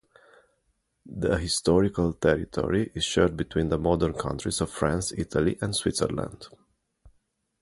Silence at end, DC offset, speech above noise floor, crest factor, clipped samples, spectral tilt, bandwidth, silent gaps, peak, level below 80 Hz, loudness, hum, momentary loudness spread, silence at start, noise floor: 0.55 s; under 0.1%; 48 dB; 20 dB; under 0.1%; -5 dB/octave; 11.5 kHz; none; -6 dBFS; -42 dBFS; -26 LUFS; none; 7 LU; 1.05 s; -74 dBFS